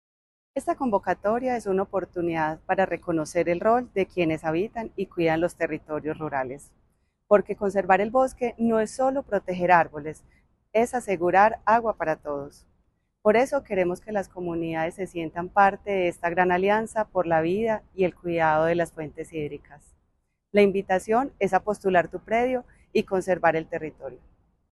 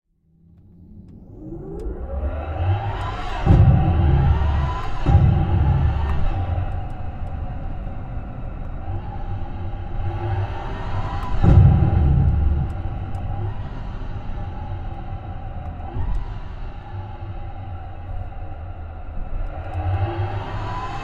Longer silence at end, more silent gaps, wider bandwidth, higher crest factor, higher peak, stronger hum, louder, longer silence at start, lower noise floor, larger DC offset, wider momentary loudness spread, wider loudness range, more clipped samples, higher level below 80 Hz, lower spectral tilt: first, 0.55 s vs 0 s; neither; first, 12.5 kHz vs 5.4 kHz; about the same, 22 dB vs 20 dB; about the same, -4 dBFS vs -2 dBFS; neither; about the same, -25 LUFS vs -23 LUFS; second, 0.55 s vs 0.8 s; first, -72 dBFS vs -55 dBFS; neither; second, 11 LU vs 18 LU; second, 3 LU vs 14 LU; neither; second, -56 dBFS vs -26 dBFS; second, -6 dB/octave vs -9 dB/octave